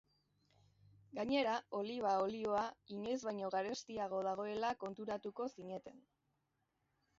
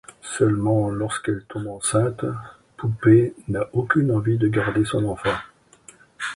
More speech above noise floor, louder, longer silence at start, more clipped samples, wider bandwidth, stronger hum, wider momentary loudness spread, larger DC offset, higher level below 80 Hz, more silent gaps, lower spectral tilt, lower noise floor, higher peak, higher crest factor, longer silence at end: first, 44 dB vs 30 dB; second, -41 LUFS vs -22 LUFS; first, 1.15 s vs 0.25 s; neither; second, 7.6 kHz vs 11.5 kHz; neither; second, 10 LU vs 13 LU; neither; second, -78 dBFS vs -50 dBFS; neither; second, -3 dB/octave vs -6 dB/octave; first, -84 dBFS vs -51 dBFS; second, -24 dBFS vs -4 dBFS; about the same, 18 dB vs 18 dB; first, 1.2 s vs 0.05 s